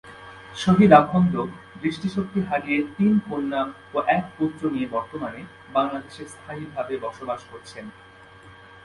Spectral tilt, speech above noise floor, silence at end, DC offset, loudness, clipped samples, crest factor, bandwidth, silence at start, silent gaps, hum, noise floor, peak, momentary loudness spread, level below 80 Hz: -7.5 dB/octave; 24 dB; 0.3 s; under 0.1%; -23 LUFS; under 0.1%; 24 dB; 11.5 kHz; 0.05 s; none; none; -47 dBFS; 0 dBFS; 22 LU; -56 dBFS